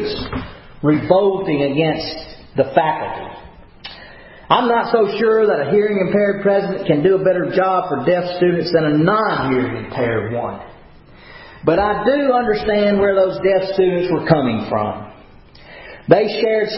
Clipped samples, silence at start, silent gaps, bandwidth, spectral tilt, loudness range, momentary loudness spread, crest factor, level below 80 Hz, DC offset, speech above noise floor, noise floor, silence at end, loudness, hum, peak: under 0.1%; 0 s; none; 5.8 kHz; -10.5 dB/octave; 4 LU; 13 LU; 18 dB; -44 dBFS; under 0.1%; 27 dB; -42 dBFS; 0 s; -17 LUFS; none; 0 dBFS